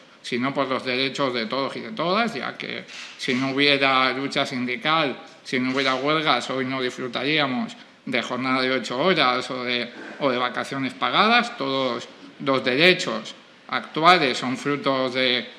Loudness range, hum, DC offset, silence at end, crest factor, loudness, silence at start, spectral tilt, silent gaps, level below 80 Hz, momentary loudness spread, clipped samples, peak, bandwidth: 3 LU; none; under 0.1%; 0 s; 22 dB; -22 LUFS; 0.25 s; -4 dB/octave; none; -72 dBFS; 12 LU; under 0.1%; 0 dBFS; 12.5 kHz